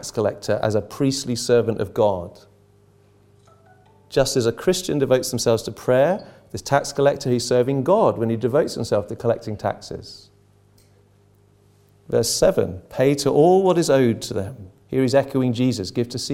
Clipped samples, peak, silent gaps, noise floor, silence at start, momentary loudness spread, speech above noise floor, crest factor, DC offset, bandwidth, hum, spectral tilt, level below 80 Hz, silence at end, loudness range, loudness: under 0.1%; -2 dBFS; none; -56 dBFS; 0 s; 10 LU; 36 dB; 20 dB; under 0.1%; 16.5 kHz; 50 Hz at -55 dBFS; -5.5 dB/octave; -50 dBFS; 0 s; 6 LU; -20 LUFS